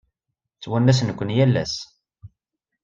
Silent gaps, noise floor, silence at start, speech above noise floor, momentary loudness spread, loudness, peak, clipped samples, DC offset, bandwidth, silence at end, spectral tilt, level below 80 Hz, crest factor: none; -82 dBFS; 0.6 s; 62 dB; 17 LU; -21 LUFS; -4 dBFS; under 0.1%; under 0.1%; 7.6 kHz; 0.55 s; -6.5 dB/octave; -54 dBFS; 18 dB